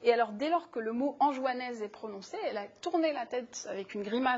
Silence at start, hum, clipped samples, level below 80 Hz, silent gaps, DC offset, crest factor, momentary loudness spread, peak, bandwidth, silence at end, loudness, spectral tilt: 0 s; none; under 0.1%; -78 dBFS; none; under 0.1%; 20 dB; 10 LU; -12 dBFS; 8 kHz; 0 s; -33 LUFS; -4 dB/octave